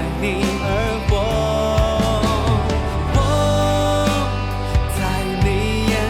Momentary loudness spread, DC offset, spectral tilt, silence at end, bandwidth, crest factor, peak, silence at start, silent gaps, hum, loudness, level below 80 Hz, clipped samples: 4 LU; under 0.1%; -5.5 dB/octave; 0 s; 16.5 kHz; 12 dB; -4 dBFS; 0 s; none; none; -19 LUFS; -24 dBFS; under 0.1%